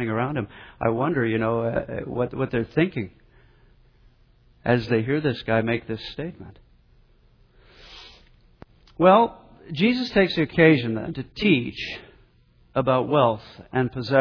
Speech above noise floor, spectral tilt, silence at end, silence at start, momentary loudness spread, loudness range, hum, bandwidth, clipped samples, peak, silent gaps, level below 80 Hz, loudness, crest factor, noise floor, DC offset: 35 dB; -8 dB/octave; 0 s; 0 s; 16 LU; 8 LU; none; 5.4 kHz; under 0.1%; -4 dBFS; none; -50 dBFS; -23 LUFS; 20 dB; -58 dBFS; under 0.1%